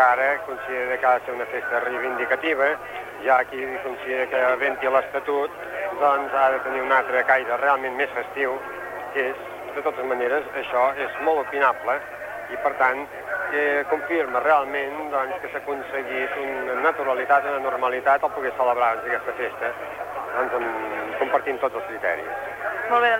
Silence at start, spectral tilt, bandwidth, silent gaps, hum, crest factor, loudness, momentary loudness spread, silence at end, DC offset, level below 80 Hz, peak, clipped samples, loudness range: 0 s; -4 dB/octave; 16.5 kHz; none; none; 18 dB; -23 LUFS; 9 LU; 0 s; under 0.1%; -62 dBFS; -4 dBFS; under 0.1%; 3 LU